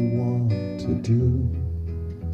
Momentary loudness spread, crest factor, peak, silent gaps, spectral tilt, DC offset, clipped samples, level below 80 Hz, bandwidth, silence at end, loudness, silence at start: 9 LU; 12 dB; -12 dBFS; none; -9.5 dB/octave; under 0.1%; under 0.1%; -36 dBFS; 7 kHz; 0 s; -25 LUFS; 0 s